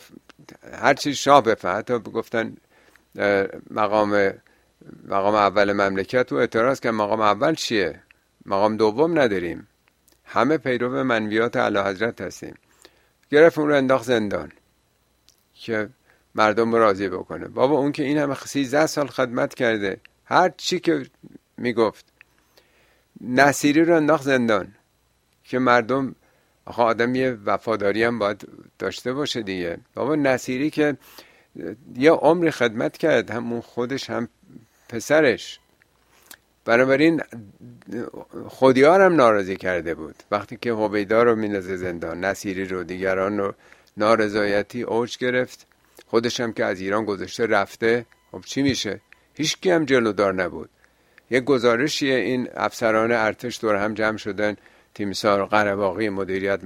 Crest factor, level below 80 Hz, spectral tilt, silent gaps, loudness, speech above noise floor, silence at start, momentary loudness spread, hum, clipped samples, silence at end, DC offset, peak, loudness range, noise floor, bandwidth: 22 dB; -60 dBFS; -5 dB/octave; none; -21 LUFS; 44 dB; 0.65 s; 13 LU; none; under 0.1%; 0 s; under 0.1%; 0 dBFS; 4 LU; -65 dBFS; 16 kHz